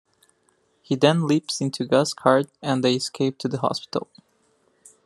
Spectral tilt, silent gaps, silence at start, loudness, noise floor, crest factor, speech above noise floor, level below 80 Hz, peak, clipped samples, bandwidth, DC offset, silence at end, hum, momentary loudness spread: -5 dB/octave; none; 0.9 s; -23 LUFS; -66 dBFS; 22 dB; 44 dB; -70 dBFS; -2 dBFS; under 0.1%; 12.5 kHz; under 0.1%; 1.05 s; none; 9 LU